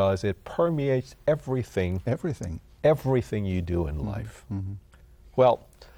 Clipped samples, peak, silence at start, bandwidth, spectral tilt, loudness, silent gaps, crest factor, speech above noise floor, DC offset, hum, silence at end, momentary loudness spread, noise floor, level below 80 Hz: under 0.1%; -8 dBFS; 0 s; 17.5 kHz; -8 dB/octave; -27 LUFS; none; 18 dB; 26 dB; under 0.1%; none; 0.15 s; 13 LU; -52 dBFS; -46 dBFS